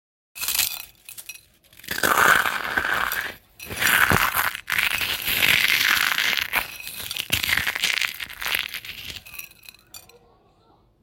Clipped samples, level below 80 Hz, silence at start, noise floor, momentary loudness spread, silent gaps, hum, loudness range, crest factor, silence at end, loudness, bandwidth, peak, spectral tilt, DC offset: under 0.1%; -50 dBFS; 0.35 s; -59 dBFS; 21 LU; none; none; 6 LU; 24 dB; 1.05 s; -21 LUFS; 17 kHz; -2 dBFS; -1 dB/octave; under 0.1%